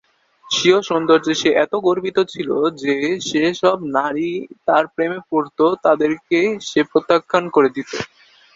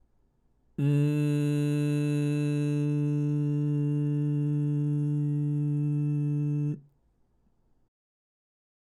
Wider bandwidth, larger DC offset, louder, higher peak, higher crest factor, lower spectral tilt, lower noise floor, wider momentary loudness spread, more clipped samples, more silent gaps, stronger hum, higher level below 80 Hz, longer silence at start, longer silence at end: second, 7.8 kHz vs 11.5 kHz; neither; first, -18 LUFS vs -28 LUFS; first, 0 dBFS vs -16 dBFS; first, 18 dB vs 12 dB; second, -4 dB/octave vs -9 dB/octave; second, -37 dBFS vs -68 dBFS; first, 7 LU vs 2 LU; neither; neither; neither; first, -60 dBFS vs -70 dBFS; second, 0.45 s vs 0.8 s; second, 0.5 s vs 2.05 s